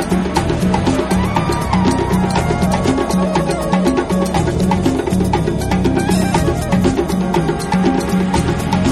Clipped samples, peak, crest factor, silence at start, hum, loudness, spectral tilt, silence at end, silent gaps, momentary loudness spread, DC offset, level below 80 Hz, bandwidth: under 0.1%; -2 dBFS; 12 dB; 0 s; none; -16 LUFS; -6 dB/octave; 0 s; none; 2 LU; under 0.1%; -28 dBFS; 14 kHz